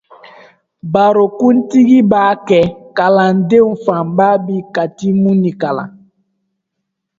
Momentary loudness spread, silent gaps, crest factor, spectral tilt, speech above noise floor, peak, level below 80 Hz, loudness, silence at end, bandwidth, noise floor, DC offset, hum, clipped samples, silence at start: 10 LU; none; 12 dB; -8 dB/octave; 63 dB; 0 dBFS; -52 dBFS; -12 LUFS; 1.3 s; 7.6 kHz; -74 dBFS; under 0.1%; none; under 0.1%; 0.85 s